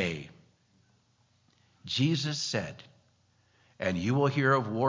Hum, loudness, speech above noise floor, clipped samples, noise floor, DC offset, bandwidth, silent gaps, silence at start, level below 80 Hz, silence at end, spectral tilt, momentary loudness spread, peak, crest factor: 60 Hz at -60 dBFS; -29 LUFS; 40 dB; under 0.1%; -69 dBFS; under 0.1%; 7.6 kHz; none; 0 s; -60 dBFS; 0 s; -5.5 dB/octave; 20 LU; -12 dBFS; 20 dB